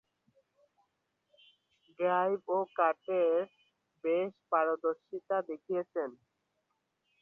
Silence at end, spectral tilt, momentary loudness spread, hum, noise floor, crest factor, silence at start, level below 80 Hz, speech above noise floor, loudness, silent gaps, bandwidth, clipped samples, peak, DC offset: 1.1 s; -8 dB/octave; 9 LU; none; -81 dBFS; 20 dB; 2 s; -86 dBFS; 49 dB; -33 LUFS; none; 3.8 kHz; under 0.1%; -14 dBFS; under 0.1%